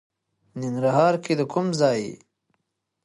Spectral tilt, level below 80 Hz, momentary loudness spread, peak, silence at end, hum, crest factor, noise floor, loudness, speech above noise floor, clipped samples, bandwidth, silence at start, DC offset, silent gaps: -6 dB/octave; -70 dBFS; 14 LU; -6 dBFS; 0.9 s; none; 20 dB; -76 dBFS; -23 LUFS; 54 dB; under 0.1%; 11.5 kHz; 0.55 s; under 0.1%; none